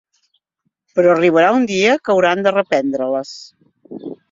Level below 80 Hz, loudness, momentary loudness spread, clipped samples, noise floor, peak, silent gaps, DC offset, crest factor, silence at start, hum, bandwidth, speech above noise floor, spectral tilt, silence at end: -62 dBFS; -15 LUFS; 20 LU; under 0.1%; -72 dBFS; 0 dBFS; none; under 0.1%; 16 dB; 0.95 s; none; 7.6 kHz; 57 dB; -5 dB/octave; 0.15 s